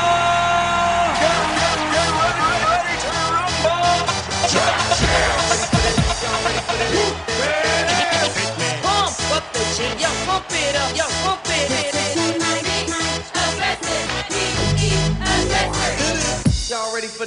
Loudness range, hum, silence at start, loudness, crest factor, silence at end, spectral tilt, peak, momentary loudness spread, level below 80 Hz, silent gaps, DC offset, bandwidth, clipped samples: 2 LU; none; 0 s; -18 LUFS; 16 dB; 0 s; -3 dB/octave; -2 dBFS; 4 LU; -32 dBFS; none; under 0.1%; 11.5 kHz; under 0.1%